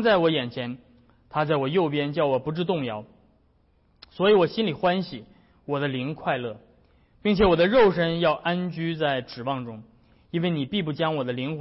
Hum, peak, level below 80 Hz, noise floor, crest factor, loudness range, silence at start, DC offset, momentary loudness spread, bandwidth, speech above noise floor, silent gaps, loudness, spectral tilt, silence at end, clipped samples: none; -10 dBFS; -50 dBFS; -63 dBFS; 14 dB; 4 LU; 0 s; under 0.1%; 15 LU; 5.8 kHz; 39 dB; none; -24 LUFS; -10 dB/octave; 0 s; under 0.1%